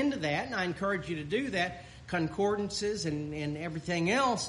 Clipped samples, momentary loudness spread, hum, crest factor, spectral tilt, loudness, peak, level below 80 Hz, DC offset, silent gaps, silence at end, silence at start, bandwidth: under 0.1%; 7 LU; none; 16 dB; -4.5 dB/octave; -32 LUFS; -16 dBFS; -56 dBFS; under 0.1%; none; 0 s; 0 s; 11.5 kHz